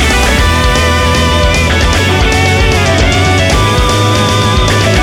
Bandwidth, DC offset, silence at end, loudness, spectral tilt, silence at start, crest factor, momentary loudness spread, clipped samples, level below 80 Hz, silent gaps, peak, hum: 17 kHz; under 0.1%; 0 s; -9 LUFS; -4.5 dB/octave; 0 s; 8 dB; 1 LU; under 0.1%; -16 dBFS; none; 0 dBFS; none